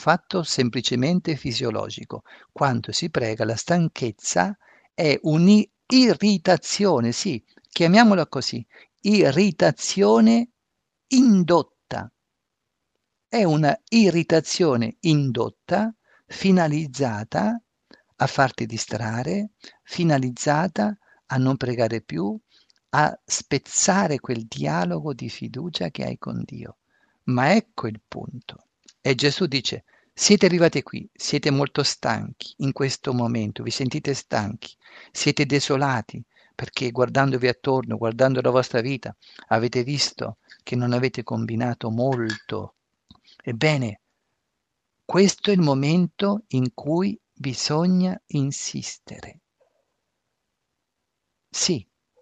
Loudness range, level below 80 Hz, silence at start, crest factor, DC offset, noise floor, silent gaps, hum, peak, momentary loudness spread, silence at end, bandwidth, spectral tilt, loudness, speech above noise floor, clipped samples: 7 LU; -60 dBFS; 0 s; 20 dB; under 0.1%; -80 dBFS; none; none; -2 dBFS; 15 LU; 0.4 s; 9.4 kHz; -5 dB/octave; -22 LUFS; 58 dB; under 0.1%